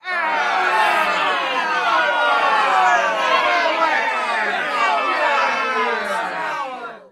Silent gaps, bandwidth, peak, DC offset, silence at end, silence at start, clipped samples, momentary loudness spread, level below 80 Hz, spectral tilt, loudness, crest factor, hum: none; 15.5 kHz; -2 dBFS; under 0.1%; 0.1 s; 0.05 s; under 0.1%; 7 LU; -72 dBFS; -1.5 dB/octave; -18 LUFS; 16 dB; none